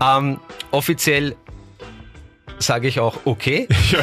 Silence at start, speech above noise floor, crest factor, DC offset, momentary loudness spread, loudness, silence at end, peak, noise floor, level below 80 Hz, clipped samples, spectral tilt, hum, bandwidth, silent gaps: 0 s; 24 dB; 14 dB; under 0.1%; 23 LU; -19 LUFS; 0 s; -6 dBFS; -42 dBFS; -36 dBFS; under 0.1%; -4.5 dB/octave; none; 15.5 kHz; none